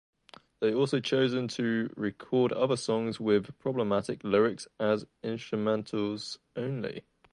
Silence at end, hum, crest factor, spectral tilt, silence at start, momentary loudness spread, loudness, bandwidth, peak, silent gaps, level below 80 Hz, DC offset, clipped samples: 0.3 s; none; 18 dB; -6 dB/octave; 0.6 s; 10 LU; -30 LUFS; 11 kHz; -12 dBFS; none; -68 dBFS; under 0.1%; under 0.1%